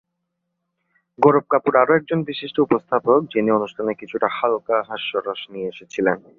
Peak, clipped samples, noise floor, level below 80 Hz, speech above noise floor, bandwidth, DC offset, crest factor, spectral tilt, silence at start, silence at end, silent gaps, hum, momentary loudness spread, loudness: -2 dBFS; under 0.1%; -77 dBFS; -64 dBFS; 57 dB; 7.2 kHz; under 0.1%; 18 dB; -7 dB/octave; 1.2 s; 0.2 s; none; none; 10 LU; -20 LUFS